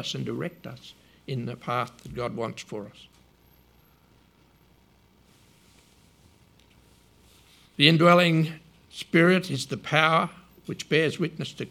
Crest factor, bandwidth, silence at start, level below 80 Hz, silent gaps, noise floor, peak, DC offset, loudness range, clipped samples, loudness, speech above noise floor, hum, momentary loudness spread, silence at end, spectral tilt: 26 dB; 15 kHz; 0 s; -62 dBFS; none; -60 dBFS; 0 dBFS; under 0.1%; 17 LU; under 0.1%; -24 LUFS; 35 dB; none; 25 LU; 0.05 s; -5.5 dB/octave